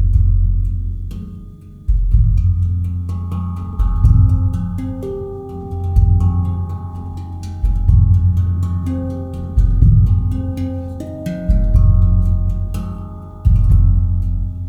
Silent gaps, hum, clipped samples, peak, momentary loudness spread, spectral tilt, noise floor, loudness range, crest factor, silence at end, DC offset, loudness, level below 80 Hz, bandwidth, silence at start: none; none; under 0.1%; 0 dBFS; 15 LU; -10 dB/octave; -35 dBFS; 4 LU; 14 dB; 0 s; under 0.1%; -17 LUFS; -18 dBFS; 2.9 kHz; 0 s